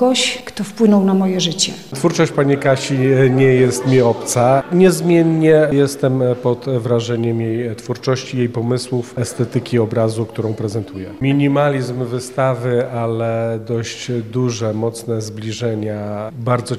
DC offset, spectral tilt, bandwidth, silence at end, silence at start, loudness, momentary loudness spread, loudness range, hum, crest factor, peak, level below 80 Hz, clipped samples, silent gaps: 0.2%; -5.5 dB/octave; 14.5 kHz; 0 s; 0 s; -17 LUFS; 10 LU; 7 LU; none; 14 dB; -2 dBFS; -54 dBFS; under 0.1%; none